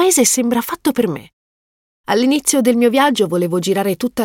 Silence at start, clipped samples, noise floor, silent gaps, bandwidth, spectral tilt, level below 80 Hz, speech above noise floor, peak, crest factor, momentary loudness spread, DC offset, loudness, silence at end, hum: 0 s; under 0.1%; under -90 dBFS; 1.33-2.04 s; 17 kHz; -3.5 dB/octave; -56 dBFS; over 75 dB; -2 dBFS; 14 dB; 7 LU; under 0.1%; -15 LUFS; 0 s; none